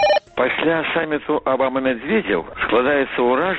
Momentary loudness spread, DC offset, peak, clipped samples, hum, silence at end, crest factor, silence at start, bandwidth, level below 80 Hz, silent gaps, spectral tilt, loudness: 4 LU; under 0.1%; -4 dBFS; under 0.1%; none; 0 s; 14 dB; 0 s; 7.6 kHz; -50 dBFS; none; -6 dB/octave; -19 LUFS